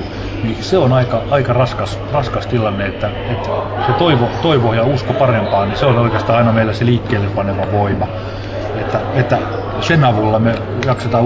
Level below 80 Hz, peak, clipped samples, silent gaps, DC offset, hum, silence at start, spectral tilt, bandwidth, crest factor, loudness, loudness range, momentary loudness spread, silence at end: -32 dBFS; -2 dBFS; under 0.1%; none; under 0.1%; none; 0 s; -7.5 dB/octave; 8 kHz; 14 dB; -15 LUFS; 3 LU; 8 LU; 0 s